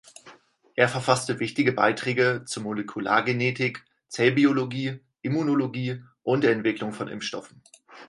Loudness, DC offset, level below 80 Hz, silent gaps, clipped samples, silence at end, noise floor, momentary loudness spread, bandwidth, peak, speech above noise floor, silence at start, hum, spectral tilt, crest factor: -25 LUFS; under 0.1%; -68 dBFS; none; under 0.1%; 0.05 s; -53 dBFS; 11 LU; 11.5 kHz; -4 dBFS; 28 dB; 0.25 s; none; -5.5 dB/octave; 22 dB